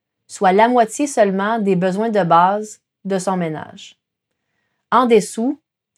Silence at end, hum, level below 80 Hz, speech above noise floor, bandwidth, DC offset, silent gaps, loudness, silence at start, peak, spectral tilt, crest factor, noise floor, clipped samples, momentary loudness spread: 0.45 s; none; -68 dBFS; 60 dB; 13.5 kHz; under 0.1%; none; -17 LUFS; 0.3 s; -2 dBFS; -5.5 dB/octave; 16 dB; -76 dBFS; under 0.1%; 18 LU